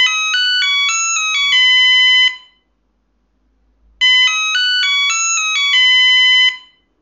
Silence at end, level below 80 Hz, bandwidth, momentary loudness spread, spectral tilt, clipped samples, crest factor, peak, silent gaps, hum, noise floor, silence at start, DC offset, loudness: 0.45 s; -62 dBFS; 7.8 kHz; 6 LU; 9.5 dB/octave; under 0.1%; 10 dB; -4 dBFS; none; none; -63 dBFS; 0 s; under 0.1%; -10 LUFS